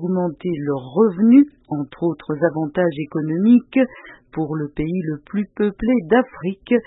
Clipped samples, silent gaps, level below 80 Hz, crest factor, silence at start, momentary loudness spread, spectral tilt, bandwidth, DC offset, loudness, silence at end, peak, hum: under 0.1%; none; -50 dBFS; 16 dB; 0 s; 12 LU; -12.5 dB/octave; 4 kHz; under 0.1%; -19 LUFS; 0.05 s; -4 dBFS; none